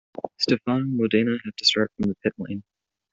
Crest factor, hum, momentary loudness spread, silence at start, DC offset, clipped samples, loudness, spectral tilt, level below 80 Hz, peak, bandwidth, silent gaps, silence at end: 20 dB; none; 14 LU; 0.15 s; under 0.1%; under 0.1%; -23 LUFS; -5 dB/octave; -60 dBFS; -4 dBFS; 8 kHz; none; 0.5 s